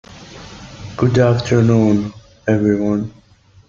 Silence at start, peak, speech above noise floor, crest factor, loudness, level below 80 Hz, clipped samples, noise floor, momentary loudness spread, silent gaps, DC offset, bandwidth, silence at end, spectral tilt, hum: 0.1 s; -2 dBFS; 22 dB; 16 dB; -16 LUFS; -46 dBFS; under 0.1%; -37 dBFS; 22 LU; none; under 0.1%; 7.4 kHz; 0.6 s; -7.5 dB/octave; none